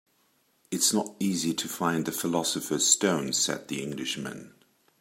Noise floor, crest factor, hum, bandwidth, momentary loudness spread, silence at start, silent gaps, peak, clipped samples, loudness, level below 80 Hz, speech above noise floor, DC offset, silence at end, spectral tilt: -68 dBFS; 24 dB; none; 16 kHz; 12 LU; 0.7 s; none; -6 dBFS; under 0.1%; -27 LUFS; -70 dBFS; 40 dB; under 0.1%; 0.5 s; -2.5 dB/octave